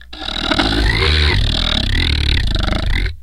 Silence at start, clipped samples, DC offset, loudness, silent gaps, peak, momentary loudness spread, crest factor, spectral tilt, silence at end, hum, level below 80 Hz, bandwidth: 0 s; under 0.1%; under 0.1%; -16 LUFS; none; 0 dBFS; 6 LU; 16 dB; -5 dB/octave; 0 s; none; -18 dBFS; 12 kHz